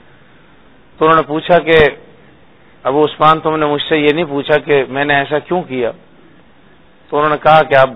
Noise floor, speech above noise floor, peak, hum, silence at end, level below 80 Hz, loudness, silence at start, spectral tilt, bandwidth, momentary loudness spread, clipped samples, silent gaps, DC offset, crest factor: -47 dBFS; 35 dB; 0 dBFS; none; 0 s; -42 dBFS; -13 LUFS; 1 s; -8 dB/octave; 5.4 kHz; 9 LU; 0.2%; none; under 0.1%; 14 dB